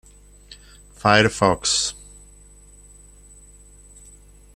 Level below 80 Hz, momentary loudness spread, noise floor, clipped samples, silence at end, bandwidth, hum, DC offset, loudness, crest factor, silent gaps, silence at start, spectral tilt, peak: -48 dBFS; 10 LU; -48 dBFS; under 0.1%; 2.65 s; 14.5 kHz; 50 Hz at -45 dBFS; under 0.1%; -19 LUFS; 24 dB; none; 0.5 s; -3 dB/octave; -2 dBFS